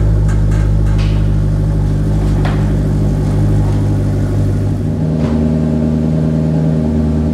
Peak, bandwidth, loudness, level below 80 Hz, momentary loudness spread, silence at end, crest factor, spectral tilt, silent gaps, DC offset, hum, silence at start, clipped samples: -2 dBFS; 10.5 kHz; -14 LUFS; -18 dBFS; 2 LU; 0 s; 10 dB; -9 dB/octave; none; under 0.1%; none; 0 s; under 0.1%